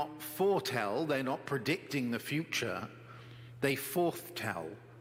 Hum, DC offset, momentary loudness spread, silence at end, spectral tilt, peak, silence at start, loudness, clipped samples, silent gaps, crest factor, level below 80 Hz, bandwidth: none; under 0.1%; 15 LU; 0 s; -4.5 dB/octave; -16 dBFS; 0 s; -35 LUFS; under 0.1%; none; 18 dB; -74 dBFS; 16.5 kHz